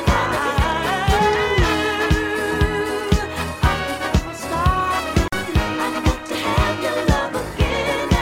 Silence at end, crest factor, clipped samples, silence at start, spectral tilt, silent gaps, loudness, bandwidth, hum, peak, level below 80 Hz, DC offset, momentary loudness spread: 0 s; 16 dB; under 0.1%; 0 s; -5 dB/octave; none; -20 LUFS; 17 kHz; none; -2 dBFS; -26 dBFS; under 0.1%; 4 LU